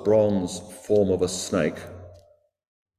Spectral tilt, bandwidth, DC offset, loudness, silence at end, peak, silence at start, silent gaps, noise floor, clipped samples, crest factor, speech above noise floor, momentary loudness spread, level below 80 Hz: -5.5 dB/octave; 14 kHz; under 0.1%; -24 LUFS; 0.85 s; -8 dBFS; 0 s; none; -59 dBFS; under 0.1%; 16 dB; 36 dB; 19 LU; -50 dBFS